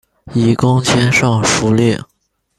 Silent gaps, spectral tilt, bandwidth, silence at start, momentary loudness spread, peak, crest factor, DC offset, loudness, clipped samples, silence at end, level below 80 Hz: none; -5 dB/octave; 13 kHz; 0.25 s; 5 LU; 0 dBFS; 14 dB; under 0.1%; -13 LUFS; under 0.1%; 0.6 s; -42 dBFS